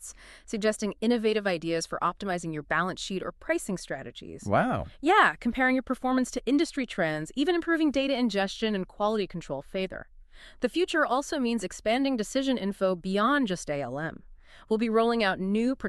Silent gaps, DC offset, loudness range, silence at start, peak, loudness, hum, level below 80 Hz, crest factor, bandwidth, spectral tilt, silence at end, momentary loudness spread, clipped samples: none; under 0.1%; 4 LU; 0 s; -6 dBFS; -28 LUFS; none; -54 dBFS; 22 dB; 13 kHz; -4.5 dB/octave; 0 s; 9 LU; under 0.1%